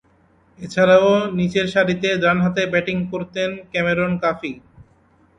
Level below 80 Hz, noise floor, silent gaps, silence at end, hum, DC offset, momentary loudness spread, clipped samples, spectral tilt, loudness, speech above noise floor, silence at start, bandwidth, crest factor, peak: -52 dBFS; -56 dBFS; none; 0.55 s; none; under 0.1%; 13 LU; under 0.1%; -6 dB/octave; -19 LUFS; 38 dB; 0.6 s; 9.6 kHz; 18 dB; -2 dBFS